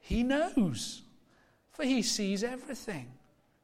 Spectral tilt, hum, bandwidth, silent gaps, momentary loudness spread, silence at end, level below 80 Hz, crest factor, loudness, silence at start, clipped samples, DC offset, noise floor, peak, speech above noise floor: -4 dB/octave; none; 16 kHz; none; 16 LU; 0.5 s; -50 dBFS; 16 dB; -32 LUFS; 0.05 s; under 0.1%; under 0.1%; -66 dBFS; -18 dBFS; 35 dB